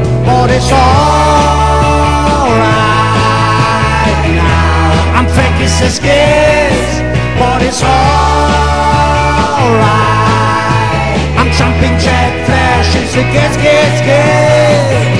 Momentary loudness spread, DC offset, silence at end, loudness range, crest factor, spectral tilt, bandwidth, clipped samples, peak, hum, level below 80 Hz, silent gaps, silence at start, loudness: 3 LU; 3%; 0 s; 1 LU; 8 dB; -5.5 dB/octave; 11 kHz; under 0.1%; 0 dBFS; none; -18 dBFS; none; 0 s; -9 LUFS